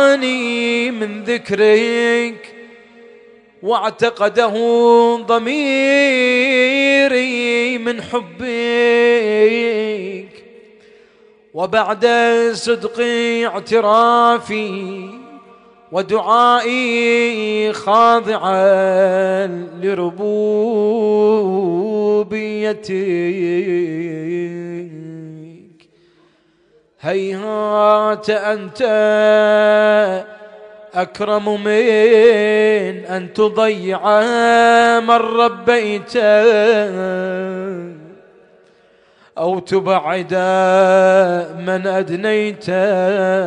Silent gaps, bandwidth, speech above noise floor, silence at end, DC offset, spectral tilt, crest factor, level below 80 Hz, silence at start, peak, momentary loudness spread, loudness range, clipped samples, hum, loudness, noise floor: none; 10.5 kHz; 41 dB; 0 s; under 0.1%; -5 dB/octave; 14 dB; -64 dBFS; 0 s; 0 dBFS; 12 LU; 7 LU; under 0.1%; none; -15 LUFS; -55 dBFS